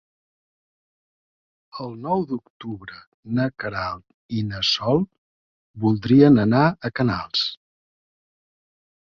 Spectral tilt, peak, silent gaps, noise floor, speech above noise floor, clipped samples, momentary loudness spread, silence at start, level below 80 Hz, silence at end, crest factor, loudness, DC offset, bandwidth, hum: -6.5 dB/octave; -4 dBFS; 2.50-2.60 s, 3.07-3.23 s, 4.14-4.29 s, 5.18-5.74 s; under -90 dBFS; over 69 dB; under 0.1%; 20 LU; 1.75 s; -54 dBFS; 1.65 s; 20 dB; -21 LUFS; under 0.1%; 7.2 kHz; none